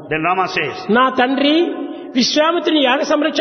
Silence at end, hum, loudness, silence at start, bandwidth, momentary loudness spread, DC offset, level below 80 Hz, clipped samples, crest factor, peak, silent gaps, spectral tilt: 0 s; none; -15 LUFS; 0 s; 6.6 kHz; 6 LU; under 0.1%; -56 dBFS; under 0.1%; 14 dB; 0 dBFS; none; -3.5 dB/octave